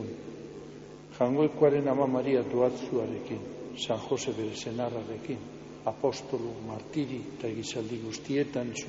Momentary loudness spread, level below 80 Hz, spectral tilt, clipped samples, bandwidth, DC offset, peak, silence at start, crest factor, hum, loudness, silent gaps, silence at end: 15 LU; -64 dBFS; -5.5 dB/octave; under 0.1%; 8 kHz; under 0.1%; -10 dBFS; 0 s; 20 dB; none; -31 LUFS; none; 0 s